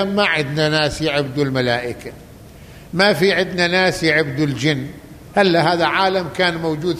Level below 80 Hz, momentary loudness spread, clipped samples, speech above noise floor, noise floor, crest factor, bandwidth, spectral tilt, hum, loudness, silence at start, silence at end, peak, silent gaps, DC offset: -46 dBFS; 8 LU; under 0.1%; 22 dB; -40 dBFS; 16 dB; 15 kHz; -5 dB/octave; none; -17 LUFS; 0 s; 0 s; -2 dBFS; none; under 0.1%